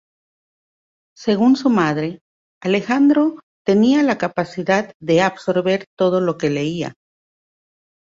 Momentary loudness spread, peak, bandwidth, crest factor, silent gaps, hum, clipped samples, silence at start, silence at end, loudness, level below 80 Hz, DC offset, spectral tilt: 10 LU; -2 dBFS; 7.6 kHz; 16 dB; 2.21-2.61 s, 3.43-3.65 s, 4.94-5.00 s, 5.87-5.97 s; none; under 0.1%; 1.2 s; 1.2 s; -18 LUFS; -60 dBFS; under 0.1%; -6.5 dB/octave